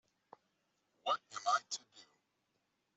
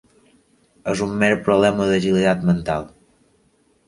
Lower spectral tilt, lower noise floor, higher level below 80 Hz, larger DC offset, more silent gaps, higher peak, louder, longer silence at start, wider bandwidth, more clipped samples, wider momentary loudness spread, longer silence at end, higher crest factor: second, 0.5 dB/octave vs -6 dB/octave; first, -83 dBFS vs -61 dBFS; second, under -90 dBFS vs -48 dBFS; neither; neither; second, -22 dBFS vs -2 dBFS; second, -38 LUFS vs -19 LUFS; first, 1.05 s vs 0.85 s; second, 8.2 kHz vs 11.5 kHz; neither; about the same, 10 LU vs 10 LU; about the same, 0.95 s vs 1 s; about the same, 22 dB vs 18 dB